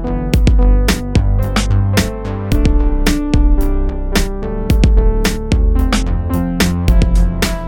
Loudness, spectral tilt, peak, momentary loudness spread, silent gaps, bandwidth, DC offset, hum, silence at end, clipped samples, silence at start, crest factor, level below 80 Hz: -15 LUFS; -5.5 dB/octave; 0 dBFS; 5 LU; none; 17 kHz; under 0.1%; none; 0 s; under 0.1%; 0 s; 12 dB; -14 dBFS